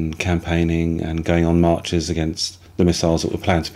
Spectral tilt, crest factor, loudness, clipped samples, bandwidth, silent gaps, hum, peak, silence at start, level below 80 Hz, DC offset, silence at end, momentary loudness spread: -5.5 dB/octave; 16 dB; -20 LUFS; under 0.1%; 13 kHz; none; none; -2 dBFS; 0 s; -34 dBFS; under 0.1%; 0 s; 6 LU